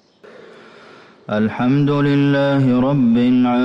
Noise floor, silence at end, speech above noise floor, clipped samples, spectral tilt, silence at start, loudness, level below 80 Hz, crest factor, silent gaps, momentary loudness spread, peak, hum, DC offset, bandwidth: -44 dBFS; 0 s; 29 dB; under 0.1%; -9 dB/octave; 1.3 s; -16 LUFS; -50 dBFS; 8 dB; none; 5 LU; -8 dBFS; none; under 0.1%; 6 kHz